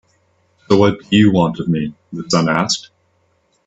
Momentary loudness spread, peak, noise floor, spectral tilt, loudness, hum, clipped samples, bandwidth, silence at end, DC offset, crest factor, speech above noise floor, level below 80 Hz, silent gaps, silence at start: 9 LU; 0 dBFS; -61 dBFS; -5.5 dB/octave; -16 LUFS; none; under 0.1%; 8.4 kHz; 0.85 s; under 0.1%; 18 dB; 46 dB; -52 dBFS; none; 0.7 s